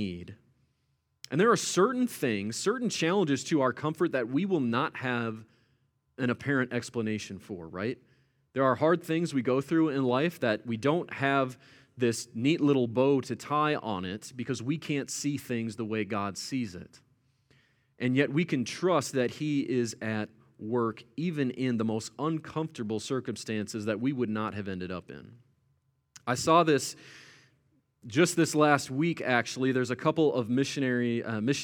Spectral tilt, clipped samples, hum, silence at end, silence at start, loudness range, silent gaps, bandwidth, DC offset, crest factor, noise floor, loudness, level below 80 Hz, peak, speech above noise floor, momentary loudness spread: -5 dB/octave; under 0.1%; none; 0 s; 0 s; 6 LU; none; 19.5 kHz; under 0.1%; 22 dB; -75 dBFS; -29 LUFS; -72 dBFS; -8 dBFS; 46 dB; 11 LU